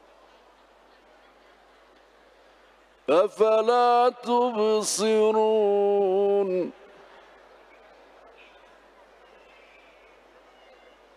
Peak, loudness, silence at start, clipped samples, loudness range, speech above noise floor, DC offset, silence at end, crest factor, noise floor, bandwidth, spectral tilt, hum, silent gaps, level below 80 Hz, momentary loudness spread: -8 dBFS; -22 LUFS; 3.1 s; under 0.1%; 10 LU; 35 dB; under 0.1%; 4.45 s; 18 dB; -57 dBFS; 14 kHz; -3.5 dB/octave; none; none; -72 dBFS; 5 LU